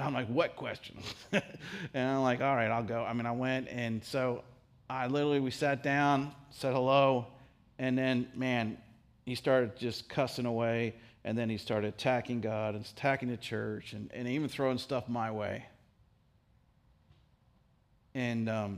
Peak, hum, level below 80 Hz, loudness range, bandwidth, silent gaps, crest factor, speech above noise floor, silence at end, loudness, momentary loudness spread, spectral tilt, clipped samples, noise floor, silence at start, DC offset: -12 dBFS; none; -68 dBFS; 7 LU; 15.5 kHz; none; 22 dB; 35 dB; 0 s; -33 LUFS; 12 LU; -6.5 dB/octave; under 0.1%; -68 dBFS; 0 s; under 0.1%